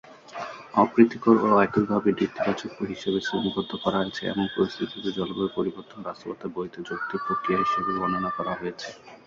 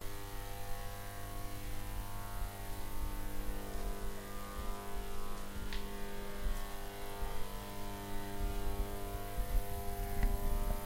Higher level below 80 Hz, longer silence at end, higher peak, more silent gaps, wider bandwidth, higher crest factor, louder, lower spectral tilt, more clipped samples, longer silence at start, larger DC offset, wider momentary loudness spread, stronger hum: second, -60 dBFS vs -40 dBFS; about the same, 0.1 s vs 0 s; first, -4 dBFS vs -20 dBFS; neither; second, 7.6 kHz vs 16 kHz; first, 22 dB vs 16 dB; first, -25 LUFS vs -44 LUFS; first, -6.5 dB/octave vs -4.5 dB/octave; neither; about the same, 0.05 s vs 0 s; neither; first, 16 LU vs 6 LU; neither